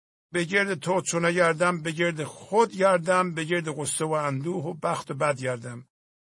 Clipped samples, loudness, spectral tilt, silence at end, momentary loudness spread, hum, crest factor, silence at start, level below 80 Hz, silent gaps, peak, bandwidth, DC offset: under 0.1%; -26 LUFS; -4.5 dB/octave; 0.4 s; 9 LU; none; 18 dB; 0.35 s; -70 dBFS; none; -8 dBFS; 11.5 kHz; under 0.1%